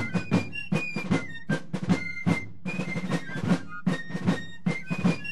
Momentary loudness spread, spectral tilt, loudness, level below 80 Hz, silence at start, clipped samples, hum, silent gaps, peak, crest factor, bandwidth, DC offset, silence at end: 4 LU; -6.5 dB/octave; -29 LUFS; -60 dBFS; 0 s; under 0.1%; none; none; -10 dBFS; 18 dB; 12 kHz; 2%; 0 s